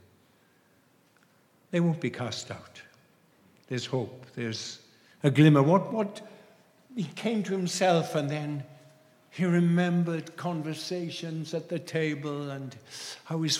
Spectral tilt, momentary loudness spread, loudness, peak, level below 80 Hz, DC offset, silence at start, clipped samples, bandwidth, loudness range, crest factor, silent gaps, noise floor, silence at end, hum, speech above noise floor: -6 dB/octave; 16 LU; -29 LUFS; -6 dBFS; -80 dBFS; under 0.1%; 1.7 s; under 0.1%; 13 kHz; 9 LU; 22 dB; none; -64 dBFS; 0 s; none; 36 dB